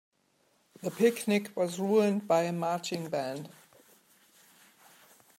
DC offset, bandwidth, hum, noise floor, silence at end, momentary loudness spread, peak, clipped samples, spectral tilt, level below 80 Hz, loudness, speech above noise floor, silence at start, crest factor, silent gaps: under 0.1%; 16 kHz; none; -71 dBFS; 1.9 s; 13 LU; -12 dBFS; under 0.1%; -5.5 dB/octave; -84 dBFS; -30 LUFS; 42 dB; 0.8 s; 20 dB; none